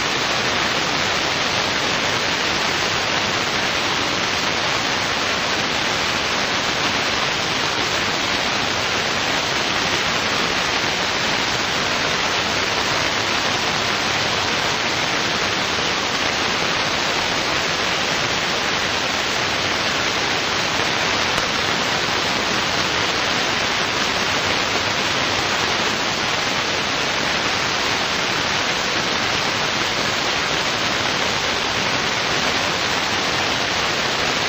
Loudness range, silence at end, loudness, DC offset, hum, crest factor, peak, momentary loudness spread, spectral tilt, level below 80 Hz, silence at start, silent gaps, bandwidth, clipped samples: 0 LU; 0 s; -18 LUFS; under 0.1%; none; 20 dB; 0 dBFS; 1 LU; -2 dB/octave; -46 dBFS; 0 s; none; 16 kHz; under 0.1%